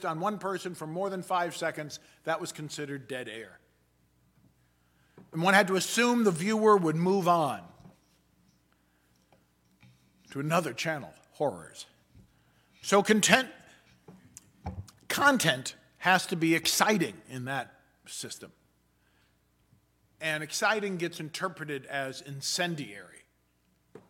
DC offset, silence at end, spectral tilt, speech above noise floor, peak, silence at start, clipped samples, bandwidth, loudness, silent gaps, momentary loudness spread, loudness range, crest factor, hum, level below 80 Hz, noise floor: under 0.1%; 1.05 s; -3.5 dB/octave; 42 dB; -4 dBFS; 0 s; under 0.1%; 17.5 kHz; -28 LUFS; none; 20 LU; 11 LU; 28 dB; none; -68 dBFS; -70 dBFS